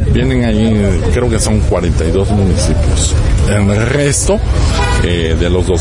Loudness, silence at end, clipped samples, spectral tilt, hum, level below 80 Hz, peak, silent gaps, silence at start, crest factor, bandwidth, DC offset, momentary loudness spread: -12 LUFS; 0 s; under 0.1%; -5.5 dB/octave; none; -16 dBFS; -4 dBFS; none; 0 s; 8 dB; 11.5 kHz; under 0.1%; 2 LU